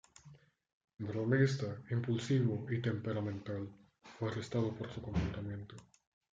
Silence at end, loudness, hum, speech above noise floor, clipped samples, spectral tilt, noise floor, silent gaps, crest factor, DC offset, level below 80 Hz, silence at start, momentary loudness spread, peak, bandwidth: 0.55 s; -37 LUFS; none; 25 dB; under 0.1%; -7 dB/octave; -61 dBFS; 0.73-0.88 s; 20 dB; under 0.1%; -60 dBFS; 0.25 s; 13 LU; -18 dBFS; 7.8 kHz